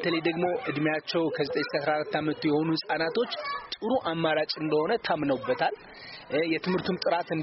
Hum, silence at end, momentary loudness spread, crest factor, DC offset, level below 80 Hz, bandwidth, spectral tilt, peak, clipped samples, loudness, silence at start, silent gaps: none; 0 s; 4 LU; 14 dB; under 0.1%; -66 dBFS; 6 kHz; -3.5 dB/octave; -14 dBFS; under 0.1%; -28 LUFS; 0 s; none